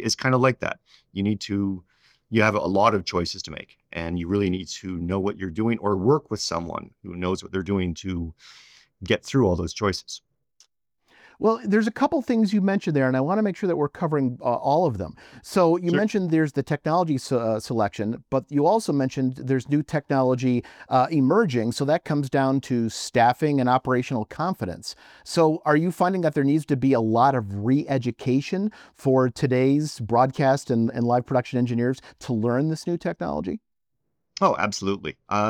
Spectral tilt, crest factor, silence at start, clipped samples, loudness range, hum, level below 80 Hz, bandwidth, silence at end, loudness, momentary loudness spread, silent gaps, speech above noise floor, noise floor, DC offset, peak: -6.5 dB/octave; 18 dB; 0 s; under 0.1%; 4 LU; none; -58 dBFS; 15 kHz; 0 s; -23 LUFS; 10 LU; none; 58 dB; -81 dBFS; under 0.1%; -4 dBFS